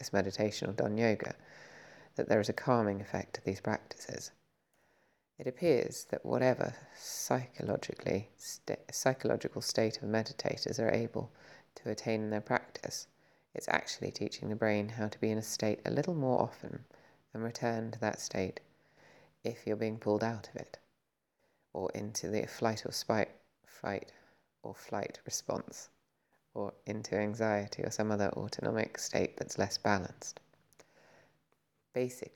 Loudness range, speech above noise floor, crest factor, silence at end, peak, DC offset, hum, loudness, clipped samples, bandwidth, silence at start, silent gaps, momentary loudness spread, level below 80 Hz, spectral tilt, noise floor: 5 LU; 47 dB; 26 dB; 0.05 s; -10 dBFS; under 0.1%; none; -36 LUFS; under 0.1%; 18.5 kHz; 0 s; none; 15 LU; -72 dBFS; -4.5 dB/octave; -82 dBFS